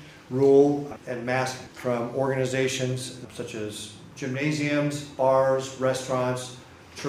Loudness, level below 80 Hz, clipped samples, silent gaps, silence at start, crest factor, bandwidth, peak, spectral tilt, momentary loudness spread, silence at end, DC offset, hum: -26 LUFS; -62 dBFS; under 0.1%; none; 0 s; 18 dB; 15.5 kHz; -8 dBFS; -5.5 dB/octave; 16 LU; 0 s; under 0.1%; none